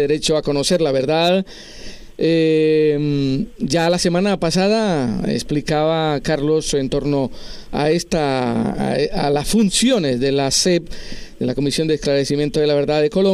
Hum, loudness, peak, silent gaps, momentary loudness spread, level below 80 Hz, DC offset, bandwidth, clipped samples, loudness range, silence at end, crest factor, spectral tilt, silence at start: none; -18 LUFS; -4 dBFS; none; 7 LU; -38 dBFS; under 0.1%; 15 kHz; under 0.1%; 2 LU; 0 s; 14 dB; -5 dB/octave; 0 s